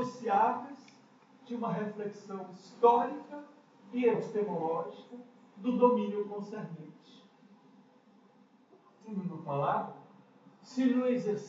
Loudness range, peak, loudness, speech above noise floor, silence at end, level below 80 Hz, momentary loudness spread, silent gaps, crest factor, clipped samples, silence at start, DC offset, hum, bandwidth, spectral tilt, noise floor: 8 LU; -12 dBFS; -32 LUFS; 31 dB; 0 s; under -90 dBFS; 21 LU; none; 22 dB; under 0.1%; 0 s; under 0.1%; none; 7.6 kHz; -6.5 dB/octave; -63 dBFS